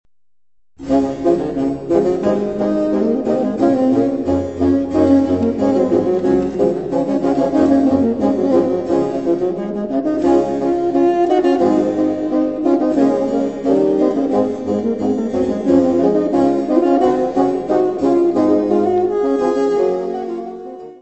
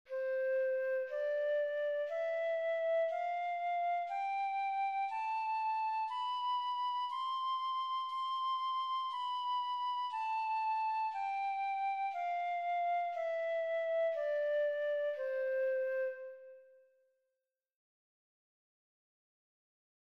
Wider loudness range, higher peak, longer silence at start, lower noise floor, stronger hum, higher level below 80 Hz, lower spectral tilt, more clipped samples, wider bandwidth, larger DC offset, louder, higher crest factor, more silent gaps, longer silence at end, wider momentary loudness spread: about the same, 2 LU vs 2 LU; first, 0 dBFS vs -28 dBFS; first, 0.8 s vs 0.1 s; second, -84 dBFS vs -89 dBFS; neither; first, -46 dBFS vs under -90 dBFS; first, -8 dB/octave vs 1 dB/octave; neither; about the same, 8.2 kHz vs 8.6 kHz; first, 0.3% vs under 0.1%; first, -16 LUFS vs -36 LUFS; first, 14 dB vs 8 dB; neither; second, 0.05 s vs 3.4 s; about the same, 5 LU vs 3 LU